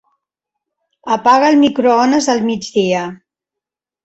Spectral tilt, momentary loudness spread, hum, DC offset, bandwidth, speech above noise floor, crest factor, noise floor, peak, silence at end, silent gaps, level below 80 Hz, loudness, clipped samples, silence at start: -4.5 dB/octave; 10 LU; none; under 0.1%; 8.2 kHz; 72 dB; 14 dB; -85 dBFS; -2 dBFS; 0.9 s; none; -58 dBFS; -13 LUFS; under 0.1%; 1.05 s